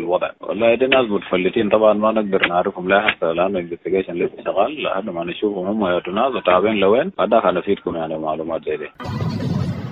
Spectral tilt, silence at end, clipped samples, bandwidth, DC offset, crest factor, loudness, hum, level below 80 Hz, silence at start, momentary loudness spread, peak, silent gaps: -7.5 dB/octave; 0 s; under 0.1%; 7.2 kHz; under 0.1%; 18 dB; -19 LUFS; none; -52 dBFS; 0 s; 9 LU; 0 dBFS; none